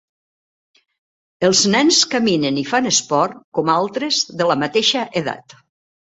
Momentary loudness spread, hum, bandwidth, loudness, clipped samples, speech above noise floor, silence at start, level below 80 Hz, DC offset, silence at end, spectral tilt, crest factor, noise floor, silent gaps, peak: 9 LU; none; 8.4 kHz; -17 LUFS; under 0.1%; over 73 dB; 1.4 s; -60 dBFS; under 0.1%; 0.75 s; -2.5 dB/octave; 18 dB; under -90 dBFS; 3.44-3.52 s; 0 dBFS